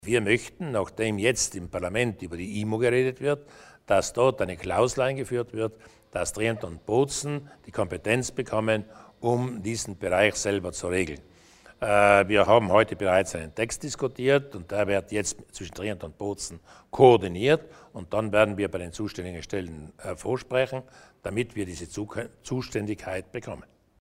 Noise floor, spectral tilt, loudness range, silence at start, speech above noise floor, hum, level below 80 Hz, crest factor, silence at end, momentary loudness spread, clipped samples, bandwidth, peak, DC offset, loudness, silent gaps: -54 dBFS; -4.5 dB/octave; 8 LU; 0.05 s; 28 dB; none; -52 dBFS; 22 dB; 0.6 s; 15 LU; under 0.1%; 16 kHz; -4 dBFS; under 0.1%; -26 LUFS; none